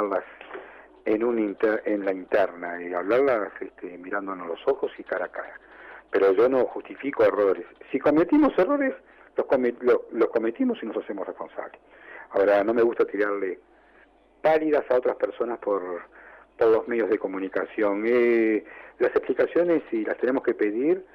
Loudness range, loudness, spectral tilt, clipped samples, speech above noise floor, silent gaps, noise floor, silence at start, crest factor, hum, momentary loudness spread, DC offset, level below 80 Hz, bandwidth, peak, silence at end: 4 LU; -25 LUFS; -8 dB/octave; under 0.1%; 33 dB; none; -57 dBFS; 0 s; 12 dB; none; 16 LU; under 0.1%; -62 dBFS; 6 kHz; -14 dBFS; 0.1 s